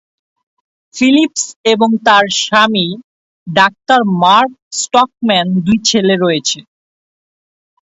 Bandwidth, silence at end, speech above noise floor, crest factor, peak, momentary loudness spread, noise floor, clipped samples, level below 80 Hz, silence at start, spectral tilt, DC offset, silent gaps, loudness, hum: 8 kHz; 1.2 s; over 78 dB; 14 dB; 0 dBFS; 8 LU; under -90 dBFS; under 0.1%; -54 dBFS; 0.95 s; -3.5 dB/octave; under 0.1%; 1.56-1.64 s, 3.04-3.46 s, 4.62-4.71 s; -12 LUFS; none